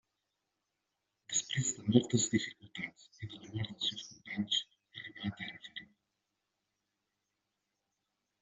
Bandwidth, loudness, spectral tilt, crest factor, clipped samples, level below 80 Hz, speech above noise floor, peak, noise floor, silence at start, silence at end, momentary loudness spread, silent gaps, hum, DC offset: 8 kHz; -35 LUFS; -4.5 dB/octave; 28 dB; under 0.1%; -74 dBFS; 51 dB; -10 dBFS; -86 dBFS; 1.3 s; 2.6 s; 18 LU; none; none; under 0.1%